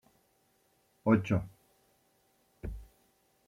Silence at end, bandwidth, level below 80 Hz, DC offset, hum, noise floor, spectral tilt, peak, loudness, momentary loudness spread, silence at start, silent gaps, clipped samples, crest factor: 0.65 s; 14 kHz; -54 dBFS; under 0.1%; none; -72 dBFS; -8.5 dB/octave; -14 dBFS; -31 LUFS; 21 LU; 1.05 s; none; under 0.1%; 22 dB